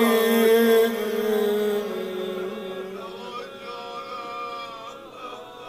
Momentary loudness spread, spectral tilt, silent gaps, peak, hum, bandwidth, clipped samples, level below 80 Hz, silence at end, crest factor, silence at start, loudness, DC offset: 19 LU; -4 dB/octave; none; -8 dBFS; none; 15.5 kHz; under 0.1%; -66 dBFS; 0 s; 16 dB; 0 s; -24 LUFS; under 0.1%